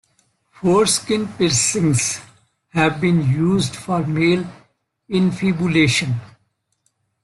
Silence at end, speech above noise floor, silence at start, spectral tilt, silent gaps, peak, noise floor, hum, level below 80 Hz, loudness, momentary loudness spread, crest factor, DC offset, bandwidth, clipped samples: 0.95 s; 50 dB; 0.6 s; -4.5 dB/octave; none; -2 dBFS; -68 dBFS; none; -52 dBFS; -18 LUFS; 8 LU; 18 dB; under 0.1%; 12.5 kHz; under 0.1%